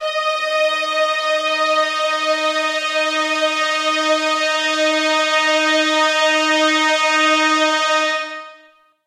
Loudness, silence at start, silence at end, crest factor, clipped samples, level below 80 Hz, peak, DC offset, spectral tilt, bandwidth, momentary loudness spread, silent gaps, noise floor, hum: -16 LUFS; 0 s; 0.5 s; 14 dB; under 0.1%; -70 dBFS; -4 dBFS; under 0.1%; 1 dB/octave; 14.5 kHz; 4 LU; none; -51 dBFS; none